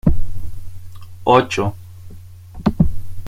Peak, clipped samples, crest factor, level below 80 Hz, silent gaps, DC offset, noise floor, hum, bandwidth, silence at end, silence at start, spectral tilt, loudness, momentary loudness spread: -2 dBFS; under 0.1%; 16 dB; -26 dBFS; none; under 0.1%; -36 dBFS; none; 10.5 kHz; 0 s; 0.05 s; -7 dB/octave; -19 LUFS; 25 LU